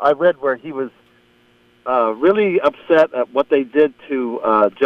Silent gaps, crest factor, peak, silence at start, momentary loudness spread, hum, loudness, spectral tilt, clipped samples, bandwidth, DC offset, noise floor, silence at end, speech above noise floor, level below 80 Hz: none; 14 dB; -2 dBFS; 0 s; 10 LU; 60 Hz at -55 dBFS; -17 LUFS; -7.5 dB/octave; under 0.1%; 6.4 kHz; under 0.1%; -54 dBFS; 0 s; 38 dB; -62 dBFS